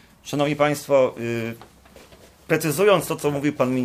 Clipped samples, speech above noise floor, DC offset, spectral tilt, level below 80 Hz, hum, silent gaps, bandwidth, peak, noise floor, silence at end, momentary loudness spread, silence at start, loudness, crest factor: under 0.1%; 28 dB; under 0.1%; -5 dB/octave; -58 dBFS; none; none; 16 kHz; -4 dBFS; -49 dBFS; 0 s; 11 LU; 0.25 s; -22 LUFS; 18 dB